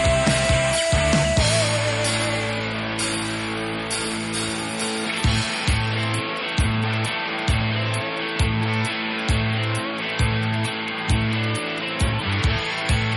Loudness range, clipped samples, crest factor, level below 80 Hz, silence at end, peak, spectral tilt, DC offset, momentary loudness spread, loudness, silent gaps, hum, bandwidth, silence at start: 3 LU; under 0.1%; 14 dB; -32 dBFS; 0 s; -8 dBFS; -4 dB/octave; under 0.1%; 6 LU; -22 LUFS; none; none; 11.5 kHz; 0 s